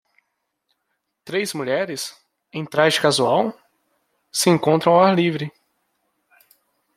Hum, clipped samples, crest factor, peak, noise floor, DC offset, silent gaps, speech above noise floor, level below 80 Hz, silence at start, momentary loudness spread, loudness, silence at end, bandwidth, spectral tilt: none; under 0.1%; 20 dB; -2 dBFS; -75 dBFS; under 0.1%; none; 57 dB; -68 dBFS; 1.25 s; 15 LU; -19 LUFS; 1.5 s; 16 kHz; -4.5 dB/octave